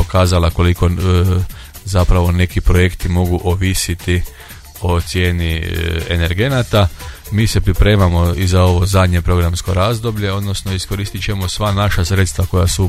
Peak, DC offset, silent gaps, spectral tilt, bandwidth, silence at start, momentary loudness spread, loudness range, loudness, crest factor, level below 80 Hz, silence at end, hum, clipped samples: 0 dBFS; under 0.1%; none; -5.5 dB/octave; 15.5 kHz; 0 s; 7 LU; 3 LU; -15 LUFS; 14 dB; -22 dBFS; 0 s; none; under 0.1%